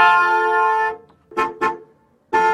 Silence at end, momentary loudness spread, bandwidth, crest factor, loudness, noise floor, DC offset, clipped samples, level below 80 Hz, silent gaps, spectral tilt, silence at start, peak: 0 s; 14 LU; 11.5 kHz; 18 dB; -18 LUFS; -52 dBFS; under 0.1%; under 0.1%; -60 dBFS; none; -3.5 dB/octave; 0 s; 0 dBFS